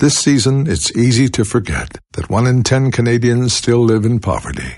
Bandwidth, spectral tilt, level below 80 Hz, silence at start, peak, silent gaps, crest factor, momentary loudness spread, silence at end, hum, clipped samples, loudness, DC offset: 11.5 kHz; -5 dB/octave; -34 dBFS; 0 s; 0 dBFS; none; 14 dB; 8 LU; 0 s; none; under 0.1%; -14 LUFS; under 0.1%